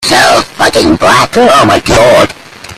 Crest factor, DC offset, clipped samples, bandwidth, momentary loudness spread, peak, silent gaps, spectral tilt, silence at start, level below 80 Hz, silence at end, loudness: 6 dB; under 0.1%; 0.7%; 16 kHz; 4 LU; 0 dBFS; none; -3.5 dB/octave; 0 s; -30 dBFS; 0 s; -6 LUFS